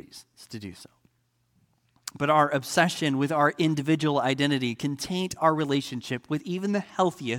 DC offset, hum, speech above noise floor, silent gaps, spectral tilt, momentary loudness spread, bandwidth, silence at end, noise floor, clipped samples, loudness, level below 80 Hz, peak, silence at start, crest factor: under 0.1%; none; 45 dB; none; -5 dB/octave; 17 LU; 17.5 kHz; 0 s; -71 dBFS; under 0.1%; -26 LUFS; -66 dBFS; -6 dBFS; 0.15 s; 20 dB